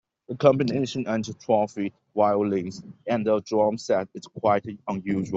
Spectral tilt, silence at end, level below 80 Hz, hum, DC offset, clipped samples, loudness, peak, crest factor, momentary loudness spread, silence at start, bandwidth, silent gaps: -6.5 dB/octave; 0 s; -64 dBFS; none; under 0.1%; under 0.1%; -25 LUFS; -4 dBFS; 20 dB; 11 LU; 0.3 s; 8 kHz; none